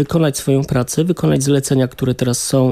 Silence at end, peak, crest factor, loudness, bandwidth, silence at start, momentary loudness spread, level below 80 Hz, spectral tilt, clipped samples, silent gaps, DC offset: 0 s; -4 dBFS; 12 dB; -16 LUFS; 15 kHz; 0 s; 3 LU; -42 dBFS; -5.5 dB/octave; under 0.1%; none; under 0.1%